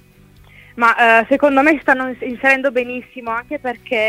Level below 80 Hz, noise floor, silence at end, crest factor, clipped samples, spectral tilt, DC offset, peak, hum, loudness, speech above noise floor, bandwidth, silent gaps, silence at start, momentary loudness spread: -52 dBFS; -46 dBFS; 0 s; 16 dB; under 0.1%; -4.5 dB/octave; under 0.1%; 0 dBFS; none; -15 LUFS; 31 dB; 16 kHz; none; 0.75 s; 13 LU